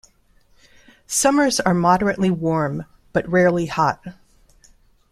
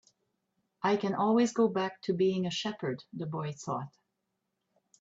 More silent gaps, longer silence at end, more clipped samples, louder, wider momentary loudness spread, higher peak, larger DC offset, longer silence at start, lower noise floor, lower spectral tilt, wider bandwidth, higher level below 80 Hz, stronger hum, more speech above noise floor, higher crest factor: neither; about the same, 1 s vs 1.1 s; neither; first, -19 LUFS vs -31 LUFS; about the same, 9 LU vs 11 LU; first, -2 dBFS vs -16 dBFS; neither; first, 1.1 s vs 0.8 s; second, -56 dBFS vs -83 dBFS; about the same, -4.5 dB/octave vs -5.5 dB/octave; first, 15 kHz vs 8 kHz; first, -50 dBFS vs -76 dBFS; neither; second, 38 dB vs 53 dB; about the same, 18 dB vs 16 dB